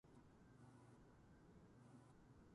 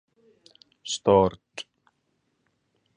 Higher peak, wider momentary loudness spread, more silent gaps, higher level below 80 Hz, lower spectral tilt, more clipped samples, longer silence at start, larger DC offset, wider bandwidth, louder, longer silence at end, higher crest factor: second, -54 dBFS vs -6 dBFS; second, 2 LU vs 22 LU; neither; second, -78 dBFS vs -54 dBFS; first, -7 dB/octave vs -5 dB/octave; neither; second, 0.05 s vs 0.85 s; neither; about the same, 11 kHz vs 10 kHz; second, -68 LUFS vs -23 LUFS; second, 0 s vs 1.35 s; second, 14 dB vs 22 dB